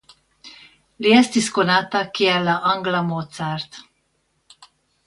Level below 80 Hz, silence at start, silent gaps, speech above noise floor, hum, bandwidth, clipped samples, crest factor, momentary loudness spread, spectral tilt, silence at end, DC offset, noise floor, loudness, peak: -62 dBFS; 0.45 s; none; 49 dB; none; 11.5 kHz; under 0.1%; 22 dB; 12 LU; -4.5 dB/octave; 1.25 s; under 0.1%; -68 dBFS; -19 LUFS; 0 dBFS